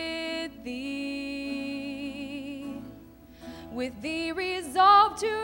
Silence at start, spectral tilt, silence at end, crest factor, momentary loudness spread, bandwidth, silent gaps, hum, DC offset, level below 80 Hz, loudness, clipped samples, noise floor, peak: 0 s; -3.5 dB/octave; 0 s; 20 dB; 21 LU; 16 kHz; none; none; under 0.1%; -58 dBFS; -27 LUFS; under 0.1%; -50 dBFS; -8 dBFS